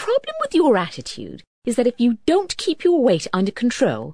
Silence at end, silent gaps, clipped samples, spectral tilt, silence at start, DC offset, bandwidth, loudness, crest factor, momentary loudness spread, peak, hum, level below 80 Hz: 0 s; 1.47-1.62 s; under 0.1%; -5 dB/octave; 0 s; 0.4%; 11 kHz; -19 LUFS; 14 dB; 14 LU; -4 dBFS; none; -54 dBFS